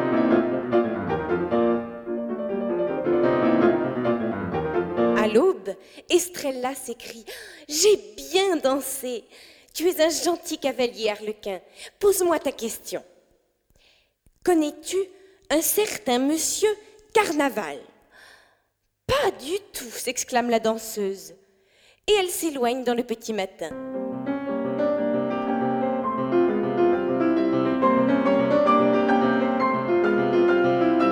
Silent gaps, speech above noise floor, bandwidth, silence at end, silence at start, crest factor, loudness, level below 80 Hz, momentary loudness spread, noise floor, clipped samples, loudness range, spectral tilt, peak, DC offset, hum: none; 48 dB; over 20 kHz; 0 s; 0 s; 18 dB; -23 LUFS; -56 dBFS; 12 LU; -73 dBFS; under 0.1%; 6 LU; -4 dB/octave; -6 dBFS; under 0.1%; none